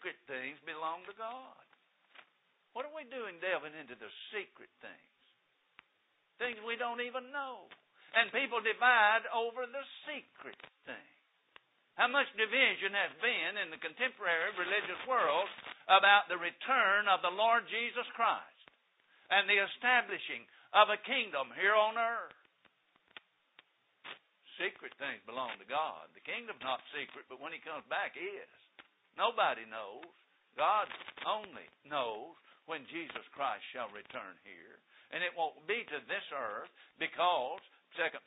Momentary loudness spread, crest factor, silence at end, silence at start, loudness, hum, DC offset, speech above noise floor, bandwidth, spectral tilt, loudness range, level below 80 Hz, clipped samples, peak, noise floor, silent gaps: 21 LU; 26 dB; 0.1 s; 0 s; -34 LUFS; none; under 0.1%; 41 dB; 3.9 kHz; 5 dB/octave; 13 LU; -90 dBFS; under 0.1%; -10 dBFS; -76 dBFS; none